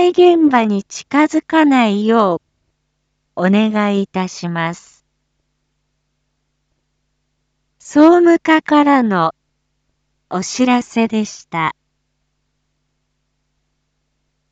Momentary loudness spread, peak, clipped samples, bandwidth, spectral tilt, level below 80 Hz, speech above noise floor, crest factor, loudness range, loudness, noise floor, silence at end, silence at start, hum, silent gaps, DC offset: 12 LU; 0 dBFS; under 0.1%; 8 kHz; -5.5 dB/octave; -62 dBFS; 56 dB; 16 dB; 12 LU; -14 LUFS; -69 dBFS; 2.8 s; 0 s; none; none; under 0.1%